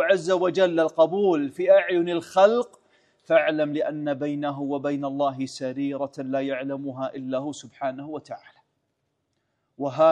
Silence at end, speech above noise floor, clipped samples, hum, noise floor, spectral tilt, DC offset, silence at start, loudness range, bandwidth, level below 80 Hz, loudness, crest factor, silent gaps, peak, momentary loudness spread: 0 s; 52 dB; under 0.1%; none; -76 dBFS; -6 dB/octave; under 0.1%; 0 s; 10 LU; 10.5 kHz; -76 dBFS; -24 LUFS; 20 dB; none; -4 dBFS; 13 LU